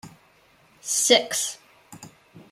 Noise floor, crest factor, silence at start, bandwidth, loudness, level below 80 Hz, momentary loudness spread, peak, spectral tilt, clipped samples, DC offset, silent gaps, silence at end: -58 dBFS; 24 dB; 0.05 s; 16 kHz; -21 LUFS; -72 dBFS; 20 LU; -2 dBFS; 0 dB/octave; under 0.1%; under 0.1%; none; 0.15 s